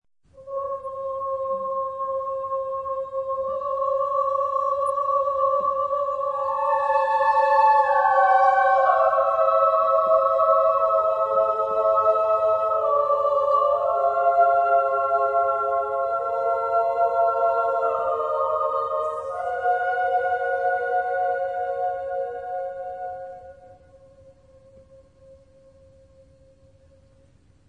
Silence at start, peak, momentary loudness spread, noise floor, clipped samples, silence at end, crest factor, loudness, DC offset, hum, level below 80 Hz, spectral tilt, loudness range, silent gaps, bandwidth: 0.35 s; -6 dBFS; 11 LU; -57 dBFS; under 0.1%; 2.35 s; 18 dB; -22 LUFS; under 0.1%; none; -62 dBFS; -4.5 dB/octave; 10 LU; none; 10.5 kHz